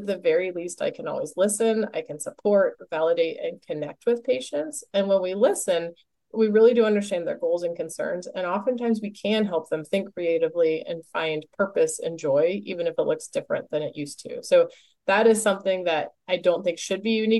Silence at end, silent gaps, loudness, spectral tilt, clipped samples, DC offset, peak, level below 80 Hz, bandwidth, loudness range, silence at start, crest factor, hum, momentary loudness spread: 0 s; none; -25 LUFS; -4 dB/octave; under 0.1%; under 0.1%; -8 dBFS; -74 dBFS; 12 kHz; 3 LU; 0 s; 16 dB; none; 9 LU